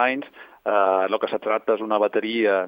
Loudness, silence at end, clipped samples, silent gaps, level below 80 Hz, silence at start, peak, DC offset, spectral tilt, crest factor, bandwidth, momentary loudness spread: -22 LUFS; 0 s; under 0.1%; none; -74 dBFS; 0 s; -6 dBFS; under 0.1%; -7 dB/octave; 16 dB; 16.5 kHz; 10 LU